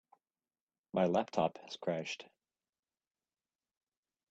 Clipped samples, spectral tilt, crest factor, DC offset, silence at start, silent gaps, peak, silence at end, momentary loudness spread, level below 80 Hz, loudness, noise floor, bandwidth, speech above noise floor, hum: under 0.1%; -6 dB/octave; 24 dB; under 0.1%; 0.95 s; none; -18 dBFS; 2.05 s; 10 LU; -78 dBFS; -36 LUFS; under -90 dBFS; 8.2 kHz; over 55 dB; none